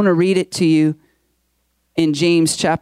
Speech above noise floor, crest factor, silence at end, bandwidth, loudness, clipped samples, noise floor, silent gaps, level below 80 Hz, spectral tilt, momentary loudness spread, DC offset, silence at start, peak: 51 dB; 12 dB; 0.05 s; 15 kHz; -16 LUFS; under 0.1%; -66 dBFS; none; -58 dBFS; -5 dB/octave; 7 LU; under 0.1%; 0 s; -6 dBFS